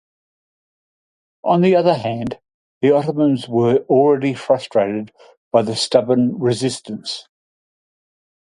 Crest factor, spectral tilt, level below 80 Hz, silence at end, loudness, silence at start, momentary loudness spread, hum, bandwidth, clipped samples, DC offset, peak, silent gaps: 18 dB; -6 dB/octave; -60 dBFS; 1.3 s; -17 LUFS; 1.45 s; 13 LU; none; 11.5 kHz; under 0.1%; under 0.1%; 0 dBFS; 2.54-2.81 s, 5.37-5.51 s